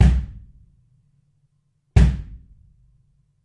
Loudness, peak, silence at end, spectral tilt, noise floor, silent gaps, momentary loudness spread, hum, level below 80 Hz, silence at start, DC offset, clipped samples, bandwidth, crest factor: -20 LUFS; -2 dBFS; 1.1 s; -7.5 dB/octave; -67 dBFS; none; 24 LU; none; -24 dBFS; 0 s; under 0.1%; under 0.1%; 9.4 kHz; 20 dB